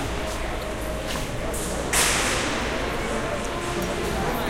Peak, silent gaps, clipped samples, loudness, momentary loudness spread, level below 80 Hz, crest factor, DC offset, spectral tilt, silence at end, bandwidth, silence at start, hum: -8 dBFS; none; under 0.1%; -25 LUFS; 9 LU; -34 dBFS; 18 dB; under 0.1%; -3 dB/octave; 0 s; 16.5 kHz; 0 s; none